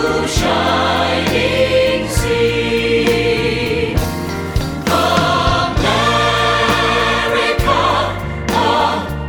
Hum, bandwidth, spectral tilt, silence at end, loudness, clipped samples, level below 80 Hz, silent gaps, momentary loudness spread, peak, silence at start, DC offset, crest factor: none; over 20 kHz; -4.5 dB/octave; 0 s; -15 LUFS; under 0.1%; -28 dBFS; none; 5 LU; 0 dBFS; 0 s; under 0.1%; 14 dB